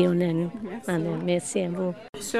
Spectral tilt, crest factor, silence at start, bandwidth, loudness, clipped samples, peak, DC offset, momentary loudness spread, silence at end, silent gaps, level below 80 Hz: -6 dB/octave; 18 dB; 0 s; 13.5 kHz; -28 LUFS; under 0.1%; -10 dBFS; 0.1%; 7 LU; 0 s; 2.09-2.13 s; -62 dBFS